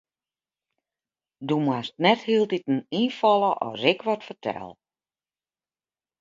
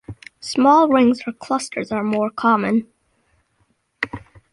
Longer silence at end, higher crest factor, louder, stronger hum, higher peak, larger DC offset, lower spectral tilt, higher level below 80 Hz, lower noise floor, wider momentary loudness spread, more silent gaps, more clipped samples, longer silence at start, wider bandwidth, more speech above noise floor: first, 1.5 s vs 0.35 s; first, 22 dB vs 16 dB; second, -24 LUFS vs -19 LUFS; neither; about the same, -4 dBFS vs -4 dBFS; neither; first, -6.5 dB/octave vs -5 dB/octave; second, -72 dBFS vs -56 dBFS; first, under -90 dBFS vs -65 dBFS; second, 12 LU vs 15 LU; neither; neither; first, 1.4 s vs 0.1 s; second, 7.6 kHz vs 11.5 kHz; first, over 66 dB vs 48 dB